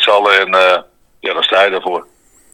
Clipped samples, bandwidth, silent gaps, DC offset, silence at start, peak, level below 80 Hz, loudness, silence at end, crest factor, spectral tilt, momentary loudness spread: 0.2%; 12.5 kHz; none; under 0.1%; 0 s; 0 dBFS; -58 dBFS; -12 LUFS; 0.5 s; 14 dB; -2 dB/octave; 13 LU